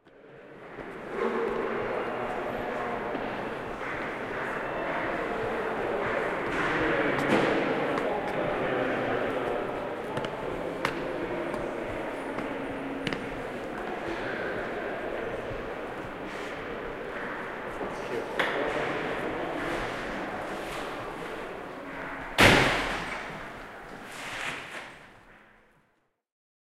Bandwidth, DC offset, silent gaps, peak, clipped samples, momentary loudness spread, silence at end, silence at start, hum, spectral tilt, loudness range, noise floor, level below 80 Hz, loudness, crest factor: 16 kHz; under 0.1%; none; -6 dBFS; under 0.1%; 11 LU; 1.25 s; 0.05 s; none; -4.5 dB/octave; 8 LU; -72 dBFS; -50 dBFS; -30 LUFS; 26 dB